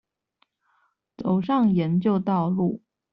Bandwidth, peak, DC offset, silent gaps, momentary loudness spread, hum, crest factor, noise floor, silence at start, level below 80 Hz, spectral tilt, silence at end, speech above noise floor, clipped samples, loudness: 5.6 kHz; -12 dBFS; under 0.1%; none; 8 LU; none; 14 dB; -71 dBFS; 1.2 s; -62 dBFS; -8.5 dB/octave; 0.35 s; 49 dB; under 0.1%; -23 LUFS